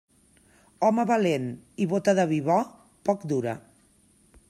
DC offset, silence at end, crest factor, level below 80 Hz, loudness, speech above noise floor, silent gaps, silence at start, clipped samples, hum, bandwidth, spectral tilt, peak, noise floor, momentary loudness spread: under 0.1%; 0.9 s; 18 dB; -68 dBFS; -26 LUFS; 37 dB; none; 0.8 s; under 0.1%; none; 13.5 kHz; -6.5 dB/octave; -8 dBFS; -61 dBFS; 11 LU